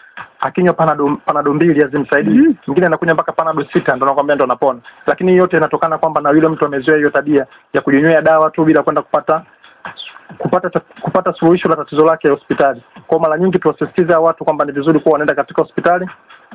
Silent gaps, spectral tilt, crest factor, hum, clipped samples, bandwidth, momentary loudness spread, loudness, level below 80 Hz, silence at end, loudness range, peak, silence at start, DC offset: none; -11 dB/octave; 14 dB; none; under 0.1%; 4 kHz; 8 LU; -14 LUFS; -52 dBFS; 0 s; 3 LU; 0 dBFS; 0.15 s; under 0.1%